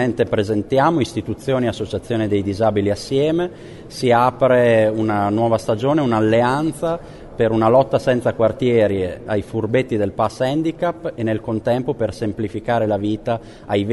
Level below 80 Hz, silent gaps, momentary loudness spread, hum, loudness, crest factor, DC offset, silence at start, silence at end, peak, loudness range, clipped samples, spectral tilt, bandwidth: -46 dBFS; none; 9 LU; none; -19 LUFS; 16 dB; under 0.1%; 0 s; 0 s; -2 dBFS; 4 LU; under 0.1%; -7 dB/octave; 11.5 kHz